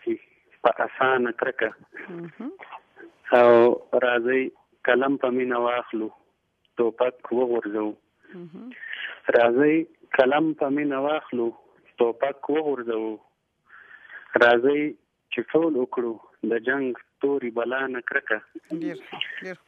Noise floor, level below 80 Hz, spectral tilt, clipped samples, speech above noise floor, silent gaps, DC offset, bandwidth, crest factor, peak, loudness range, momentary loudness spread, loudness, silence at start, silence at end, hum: -70 dBFS; -74 dBFS; -7 dB/octave; under 0.1%; 46 dB; none; under 0.1%; 6.2 kHz; 22 dB; -2 dBFS; 6 LU; 19 LU; -24 LUFS; 0.05 s; 0.15 s; none